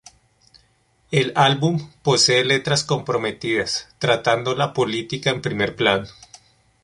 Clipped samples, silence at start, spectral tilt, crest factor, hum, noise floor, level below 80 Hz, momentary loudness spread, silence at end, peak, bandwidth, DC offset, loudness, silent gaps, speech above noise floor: under 0.1%; 1.1 s; -4 dB/octave; 20 dB; none; -61 dBFS; -54 dBFS; 8 LU; 0.7 s; -2 dBFS; 11.5 kHz; under 0.1%; -20 LUFS; none; 41 dB